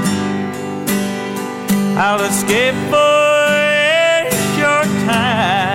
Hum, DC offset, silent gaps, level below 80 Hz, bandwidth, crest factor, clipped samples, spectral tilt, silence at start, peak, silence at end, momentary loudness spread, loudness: 50 Hz at -30 dBFS; under 0.1%; none; -54 dBFS; 16.5 kHz; 12 dB; under 0.1%; -4 dB/octave; 0 s; -4 dBFS; 0 s; 10 LU; -14 LUFS